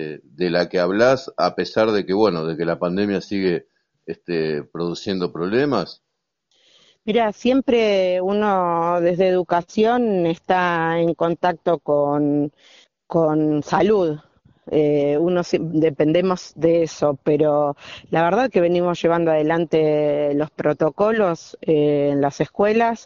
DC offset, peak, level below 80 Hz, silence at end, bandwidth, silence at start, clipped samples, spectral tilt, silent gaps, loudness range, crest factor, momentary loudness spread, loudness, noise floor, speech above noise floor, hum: under 0.1%; -4 dBFS; -56 dBFS; 0.05 s; 7.2 kHz; 0 s; under 0.1%; -5 dB/octave; none; 4 LU; 16 dB; 7 LU; -20 LUFS; -71 dBFS; 52 dB; none